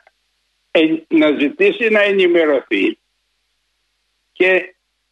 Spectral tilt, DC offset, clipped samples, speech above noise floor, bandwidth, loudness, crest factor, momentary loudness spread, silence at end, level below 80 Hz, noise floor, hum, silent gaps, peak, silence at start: -6 dB/octave; under 0.1%; under 0.1%; 53 dB; 8.2 kHz; -15 LUFS; 14 dB; 5 LU; 0.45 s; -70 dBFS; -68 dBFS; none; none; -2 dBFS; 0.75 s